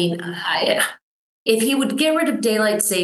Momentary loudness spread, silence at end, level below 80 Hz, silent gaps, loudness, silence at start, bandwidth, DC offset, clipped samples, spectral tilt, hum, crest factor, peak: 5 LU; 0 s; -74 dBFS; 1.02-1.46 s; -19 LUFS; 0 s; 13 kHz; under 0.1%; under 0.1%; -3 dB/octave; none; 18 dB; -2 dBFS